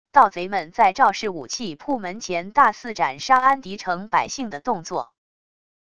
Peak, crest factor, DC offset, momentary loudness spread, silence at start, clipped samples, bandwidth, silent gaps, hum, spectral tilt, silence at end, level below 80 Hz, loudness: 0 dBFS; 22 dB; 0.5%; 12 LU; 0.15 s; under 0.1%; 10 kHz; none; none; -3.5 dB/octave; 0.8 s; -60 dBFS; -21 LUFS